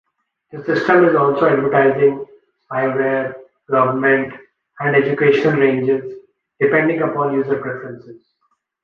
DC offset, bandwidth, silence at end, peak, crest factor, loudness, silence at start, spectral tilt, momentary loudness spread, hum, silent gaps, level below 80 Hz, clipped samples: under 0.1%; 6.6 kHz; 0.7 s; -2 dBFS; 16 dB; -16 LUFS; 0.55 s; -8.5 dB/octave; 15 LU; none; none; -62 dBFS; under 0.1%